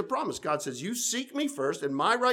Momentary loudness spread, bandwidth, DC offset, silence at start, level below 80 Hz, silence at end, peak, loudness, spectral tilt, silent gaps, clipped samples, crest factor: 5 LU; 19.5 kHz; under 0.1%; 0 s; -72 dBFS; 0 s; -12 dBFS; -30 LUFS; -3 dB/octave; none; under 0.1%; 18 dB